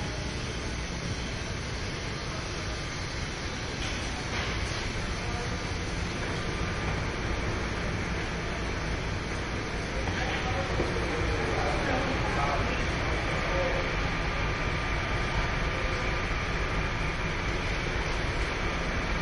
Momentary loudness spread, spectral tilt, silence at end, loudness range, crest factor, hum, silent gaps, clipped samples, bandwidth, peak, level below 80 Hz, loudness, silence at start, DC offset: 5 LU; -4.5 dB/octave; 0 s; 4 LU; 14 dB; none; none; under 0.1%; 11.5 kHz; -16 dBFS; -36 dBFS; -31 LUFS; 0 s; under 0.1%